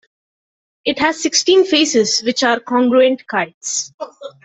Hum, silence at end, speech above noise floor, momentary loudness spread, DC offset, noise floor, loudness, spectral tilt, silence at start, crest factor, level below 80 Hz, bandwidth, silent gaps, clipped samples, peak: none; 0.15 s; over 74 dB; 11 LU; under 0.1%; under -90 dBFS; -15 LUFS; -2 dB/octave; 0.85 s; 14 dB; -60 dBFS; 8.4 kHz; 3.54-3.61 s, 3.94-3.98 s; under 0.1%; -2 dBFS